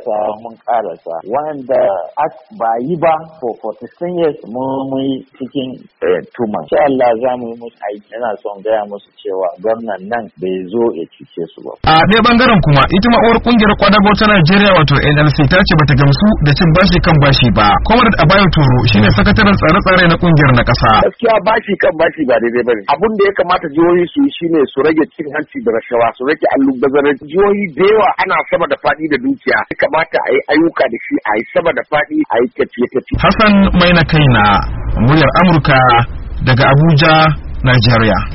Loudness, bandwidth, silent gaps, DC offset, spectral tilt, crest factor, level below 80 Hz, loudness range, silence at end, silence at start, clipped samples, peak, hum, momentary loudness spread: -11 LUFS; 6 kHz; none; under 0.1%; -4.5 dB/octave; 12 dB; -28 dBFS; 9 LU; 0 s; 0 s; under 0.1%; 0 dBFS; none; 12 LU